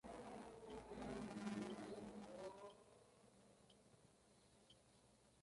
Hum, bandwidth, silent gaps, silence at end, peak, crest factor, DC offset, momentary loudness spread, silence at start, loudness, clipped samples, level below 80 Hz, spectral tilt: none; 11.5 kHz; none; 0 s; -34 dBFS; 22 dB; under 0.1%; 13 LU; 0.05 s; -54 LUFS; under 0.1%; -74 dBFS; -5.5 dB/octave